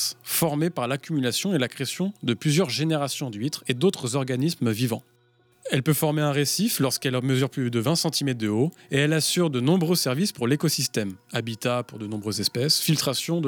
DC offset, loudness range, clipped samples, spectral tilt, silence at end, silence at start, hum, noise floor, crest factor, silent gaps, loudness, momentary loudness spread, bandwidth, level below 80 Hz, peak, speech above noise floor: under 0.1%; 2 LU; under 0.1%; -4.5 dB/octave; 0 s; 0 s; none; -62 dBFS; 16 dB; none; -24 LUFS; 7 LU; over 20 kHz; -68 dBFS; -8 dBFS; 38 dB